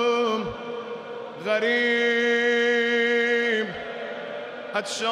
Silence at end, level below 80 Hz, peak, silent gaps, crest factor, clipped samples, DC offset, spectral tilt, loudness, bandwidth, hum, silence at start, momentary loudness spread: 0 s; -64 dBFS; -12 dBFS; none; 12 dB; under 0.1%; under 0.1%; -3 dB/octave; -23 LUFS; 11 kHz; none; 0 s; 13 LU